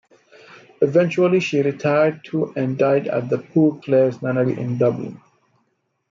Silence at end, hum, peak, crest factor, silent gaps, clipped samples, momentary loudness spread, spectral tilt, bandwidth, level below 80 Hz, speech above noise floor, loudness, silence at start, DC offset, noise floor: 0.95 s; none; -4 dBFS; 16 dB; none; under 0.1%; 6 LU; -7.5 dB/octave; 7.6 kHz; -68 dBFS; 51 dB; -19 LUFS; 0.8 s; under 0.1%; -69 dBFS